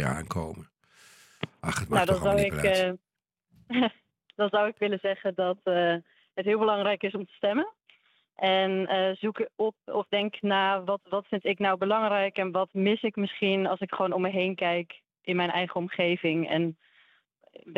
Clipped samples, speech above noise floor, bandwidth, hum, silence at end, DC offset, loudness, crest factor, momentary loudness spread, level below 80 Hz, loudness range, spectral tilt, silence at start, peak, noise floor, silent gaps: under 0.1%; 49 dB; 16 kHz; none; 0 s; under 0.1%; -28 LUFS; 18 dB; 9 LU; -58 dBFS; 2 LU; -5.5 dB/octave; 0 s; -10 dBFS; -76 dBFS; none